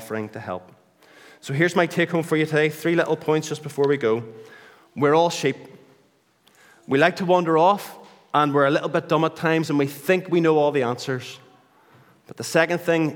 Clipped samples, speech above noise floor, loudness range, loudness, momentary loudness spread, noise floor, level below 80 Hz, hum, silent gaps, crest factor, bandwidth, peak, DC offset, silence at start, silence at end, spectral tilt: under 0.1%; 40 dB; 3 LU; -21 LUFS; 13 LU; -61 dBFS; -76 dBFS; none; none; 20 dB; 19 kHz; -2 dBFS; under 0.1%; 0 s; 0 s; -5.5 dB/octave